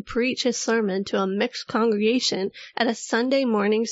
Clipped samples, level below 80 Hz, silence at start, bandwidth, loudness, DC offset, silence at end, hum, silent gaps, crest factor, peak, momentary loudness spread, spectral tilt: under 0.1%; -60 dBFS; 0.05 s; 8 kHz; -23 LUFS; under 0.1%; 0 s; none; none; 16 dB; -8 dBFS; 4 LU; -4 dB/octave